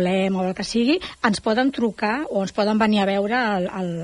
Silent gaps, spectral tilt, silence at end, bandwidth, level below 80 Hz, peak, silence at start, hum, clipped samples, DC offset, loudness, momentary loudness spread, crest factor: none; -5.5 dB/octave; 0 s; 11 kHz; -54 dBFS; -4 dBFS; 0 s; none; under 0.1%; under 0.1%; -21 LUFS; 5 LU; 18 dB